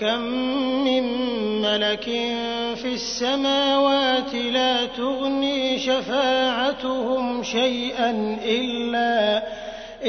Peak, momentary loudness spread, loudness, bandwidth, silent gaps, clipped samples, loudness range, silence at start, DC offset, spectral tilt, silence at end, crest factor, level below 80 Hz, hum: -8 dBFS; 6 LU; -22 LUFS; 6.6 kHz; none; under 0.1%; 2 LU; 0 s; under 0.1%; -3.5 dB/octave; 0 s; 14 dB; -54 dBFS; none